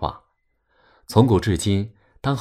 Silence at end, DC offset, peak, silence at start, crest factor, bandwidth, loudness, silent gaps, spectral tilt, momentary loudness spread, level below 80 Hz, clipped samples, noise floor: 0 s; under 0.1%; -2 dBFS; 0 s; 20 dB; 14 kHz; -21 LUFS; none; -6.5 dB/octave; 13 LU; -42 dBFS; under 0.1%; -68 dBFS